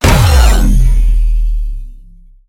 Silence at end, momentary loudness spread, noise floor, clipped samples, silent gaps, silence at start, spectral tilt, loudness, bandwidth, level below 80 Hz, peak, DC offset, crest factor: 0.55 s; 15 LU; -37 dBFS; 0.2%; none; 0 s; -5 dB/octave; -12 LUFS; 16.5 kHz; -10 dBFS; 0 dBFS; under 0.1%; 10 dB